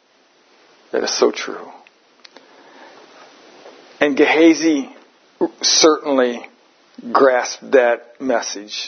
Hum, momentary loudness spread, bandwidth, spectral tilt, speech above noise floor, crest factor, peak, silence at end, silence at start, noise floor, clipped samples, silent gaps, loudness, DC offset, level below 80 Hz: none; 15 LU; 6.6 kHz; -1.5 dB/octave; 39 dB; 18 dB; 0 dBFS; 0 s; 0.95 s; -55 dBFS; under 0.1%; none; -16 LUFS; under 0.1%; -74 dBFS